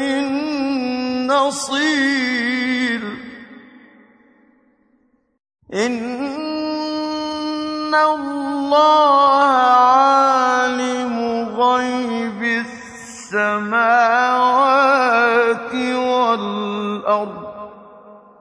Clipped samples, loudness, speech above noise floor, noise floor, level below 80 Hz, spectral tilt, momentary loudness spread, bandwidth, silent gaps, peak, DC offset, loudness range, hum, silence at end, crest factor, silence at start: under 0.1%; -17 LUFS; 45 dB; -61 dBFS; -62 dBFS; -3.5 dB/octave; 12 LU; 10.5 kHz; none; -2 dBFS; under 0.1%; 12 LU; none; 0.25 s; 16 dB; 0 s